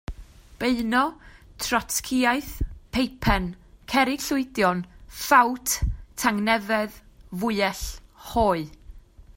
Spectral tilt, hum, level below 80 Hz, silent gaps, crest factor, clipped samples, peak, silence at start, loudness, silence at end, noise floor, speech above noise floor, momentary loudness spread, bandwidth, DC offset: -4 dB/octave; none; -38 dBFS; none; 22 dB; under 0.1%; -4 dBFS; 0.1 s; -24 LUFS; 0.15 s; -46 dBFS; 22 dB; 13 LU; 16.5 kHz; under 0.1%